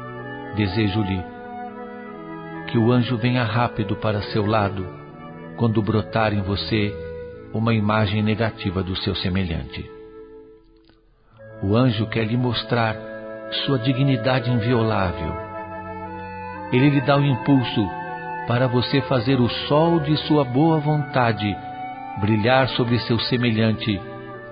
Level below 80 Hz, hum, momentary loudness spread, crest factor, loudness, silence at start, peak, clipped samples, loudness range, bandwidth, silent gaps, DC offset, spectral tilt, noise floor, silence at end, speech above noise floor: -42 dBFS; none; 15 LU; 20 dB; -21 LUFS; 0 s; -2 dBFS; under 0.1%; 4 LU; 5.2 kHz; none; under 0.1%; -11.5 dB/octave; -55 dBFS; 0 s; 35 dB